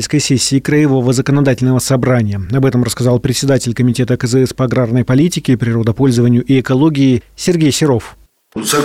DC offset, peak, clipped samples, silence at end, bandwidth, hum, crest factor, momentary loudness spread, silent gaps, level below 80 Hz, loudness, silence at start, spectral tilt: under 0.1%; -4 dBFS; under 0.1%; 0 s; 16 kHz; none; 10 dB; 4 LU; none; -40 dBFS; -13 LUFS; 0 s; -5.5 dB/octave